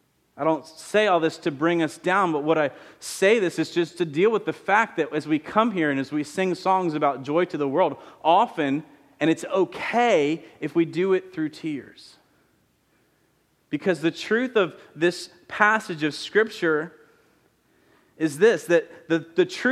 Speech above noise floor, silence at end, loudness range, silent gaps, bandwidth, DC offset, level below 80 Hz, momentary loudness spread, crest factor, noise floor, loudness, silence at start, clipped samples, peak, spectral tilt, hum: 43 dB; 0 s; 5 LU; none; 14.5 kHz; under 0.1%; -72 dBFS; 8 LU; 22 dB; -66 dBFS; -23 LUFS; 0.35 s; under 0.1%; -2 dBFS; -5 dB/octave; none